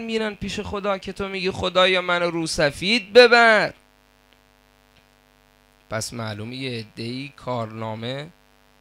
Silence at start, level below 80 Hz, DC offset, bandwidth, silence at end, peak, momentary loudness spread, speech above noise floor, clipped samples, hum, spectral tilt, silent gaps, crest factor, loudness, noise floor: 0 s; -52 dBFS; under 0.1%; 15 kHz; 0.55 s; 0 dBFS; 18 LU; 36 dB; under 0.1%; none; -4 dB/octave; none; 22 dB; -21 LUFS; -57 dBFS